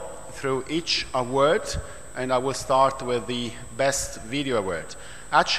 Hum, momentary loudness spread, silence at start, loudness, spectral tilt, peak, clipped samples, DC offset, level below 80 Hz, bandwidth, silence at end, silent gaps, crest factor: none; 12 LU; 0 s; -25 LUFS; -3.5 dB/octave; -6 dBFS; under 0.1%; 0.9%; -46 dBFS; 14 kHz; 0 s; none; 20 dB